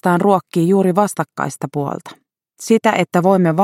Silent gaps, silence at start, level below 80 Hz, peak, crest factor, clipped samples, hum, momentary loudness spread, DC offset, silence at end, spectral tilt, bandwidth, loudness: none; 0.05 s; -64 dBFS; 0 dBFS; 16 dB; under 0.1%; none; 10 LU; under 0.1%; 0 s; -6.5 dB/octave; 16 kHz; -16 LUFS